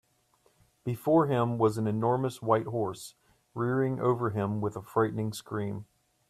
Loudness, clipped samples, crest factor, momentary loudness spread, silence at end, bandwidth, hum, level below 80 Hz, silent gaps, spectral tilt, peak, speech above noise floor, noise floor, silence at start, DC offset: -29 LUFS; under 0.1%; 18 dB; 12 LU; 0.45 s; 14 kHz; none; -66 dBFS; none; -7.5 dB/octave; -12 dBFS; 40 dB; -69 dBFS; 0.85 s; under 0.1%